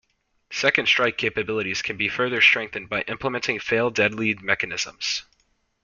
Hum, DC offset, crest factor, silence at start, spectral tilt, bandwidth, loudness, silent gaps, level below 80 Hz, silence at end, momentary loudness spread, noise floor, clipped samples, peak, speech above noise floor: none; under 0.1%; 24 dB; 0.5 s; -3 dB/octave; 7.4 kHz; -22 LUFS; none; -58 dBFS; 0.6 s; 10 LU; -68 dBFS; under 0.1%; 0 dBFS; 44 dB